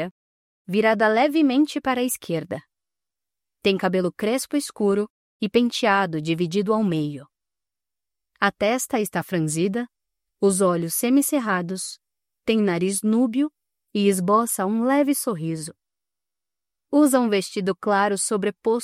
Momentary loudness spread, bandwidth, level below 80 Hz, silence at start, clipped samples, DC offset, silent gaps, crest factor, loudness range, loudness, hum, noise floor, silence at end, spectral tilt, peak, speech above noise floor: 11 LU; 16 kHz; -66 dBFS; 0 s; under 0.1%; under 0.1%; 0.11-0.65 s, 5.10-5.40 s; 18 dB; 3 LU; -22 LUFS; none; under -90 dBFS; 0 s; -4.5 dB/octave; -6 dBFS; over 69 dB